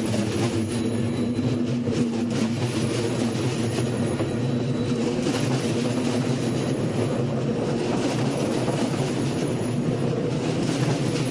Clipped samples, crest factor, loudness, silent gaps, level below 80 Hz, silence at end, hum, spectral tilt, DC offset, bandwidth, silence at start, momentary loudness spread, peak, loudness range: under 0.1%; 14 dB; -25 LUFS; none; -52 dBFS; 0 s; none; -6 dB/octave; under 0.1%; 11.5 kHz; 0 s; 1 LU; -10 dBFS; 0 LU